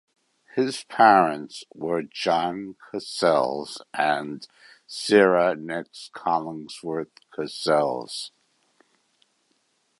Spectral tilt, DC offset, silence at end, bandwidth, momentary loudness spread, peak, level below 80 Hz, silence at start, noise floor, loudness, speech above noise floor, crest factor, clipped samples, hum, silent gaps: -4.5 dB/octave; under 0.1%; 1.7 s; 11.5 kHz; 18 LU; -2 dBFS; -70 dBFS; 0.55 s; -69 dBFS; -24 LUFS; 46 dB; 22 dB; under 0.1%; none; none